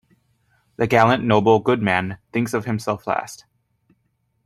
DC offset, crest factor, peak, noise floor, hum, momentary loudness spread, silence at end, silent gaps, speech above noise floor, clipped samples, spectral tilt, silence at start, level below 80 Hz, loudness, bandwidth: under 0.1%; 20 dB; -2 dBFS; -69 dBFS; none; 10 LU; 1.1 s; none; 50 dB; under 0.1%; -6 dB/octave; 0.8 s; -56 dBFS; -20 LUFS; 14 kHz